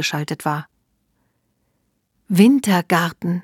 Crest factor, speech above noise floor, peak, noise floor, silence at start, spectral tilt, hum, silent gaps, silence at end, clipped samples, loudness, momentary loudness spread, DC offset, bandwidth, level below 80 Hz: 20 dB; 51 dB; 0 dBFS; -69 dBFS; 0 s; -5.5 dB/octave; none; none; 0 s; under 0.1%; -18 LUFS; 11 LU; under 0.1%; 18 kHz; -66 dBFS